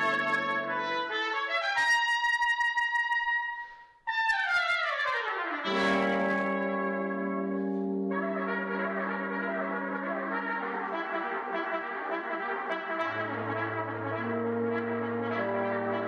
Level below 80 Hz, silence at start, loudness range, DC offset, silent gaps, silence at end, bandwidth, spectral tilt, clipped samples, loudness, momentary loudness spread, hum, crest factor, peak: -72 dBFS; 0 s; 5 LU; under 0.1%; none; 0 s; 11.5 kHz; -5 dB/octave; under 0.1%; -30 LUFS; 7 LU; none; 12 dB; -18 dBFS